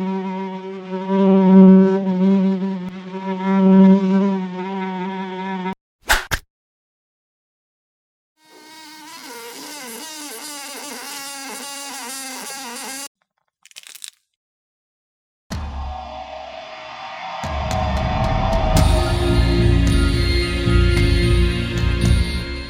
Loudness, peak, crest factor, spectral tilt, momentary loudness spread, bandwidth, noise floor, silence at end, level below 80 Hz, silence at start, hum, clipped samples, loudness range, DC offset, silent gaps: -18 LUFS; 0 dBFS; 18 dB; -6 dB/octave; 20 LU; 17.5 kHz; -58 dBFS; 0 s; -26 dBFS; 0 s; none; under 0.1%; 19 LU; under 0.1%; 5.81-5.99 s, 6.50-8.36 s, 13.07-13.15 s, 14.36-15.50 s